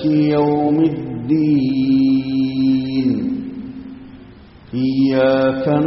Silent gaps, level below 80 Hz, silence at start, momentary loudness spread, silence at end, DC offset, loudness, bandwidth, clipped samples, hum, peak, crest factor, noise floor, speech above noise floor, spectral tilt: none; -48 dBFS; 0 s; 15 LU; 0 s; under 0.1%; -17 LUFS; 5.8 kHz; under 0.1%; none; -4 dBFS; 12 dB; -41 dBFS; 26 dB; -7 dB/octave